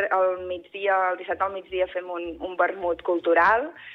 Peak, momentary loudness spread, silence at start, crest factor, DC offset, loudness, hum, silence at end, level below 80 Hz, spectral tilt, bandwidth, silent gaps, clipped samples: -8 dBFS; 13 LU; 0 s; 16 dB; under 0.1%; -25 LUFS; none; 0 s; -58 dBFS; -6 dB/octave; 6.2 kHz; none; under 0.1%